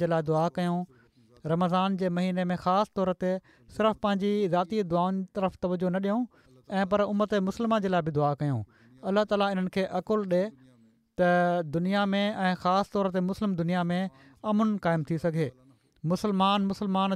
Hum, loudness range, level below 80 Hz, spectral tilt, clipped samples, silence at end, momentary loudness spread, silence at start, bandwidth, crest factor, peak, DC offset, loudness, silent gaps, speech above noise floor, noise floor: none; 1 LU; -62 dBFS; -7.5 dB/octave; under 0.1%; 0 s; 7 LU; 0 s; 12 kHz; 14 dB; -14 dBFS; under 0.1%; -28 LUFS; none; 34 dB; -61 dBFS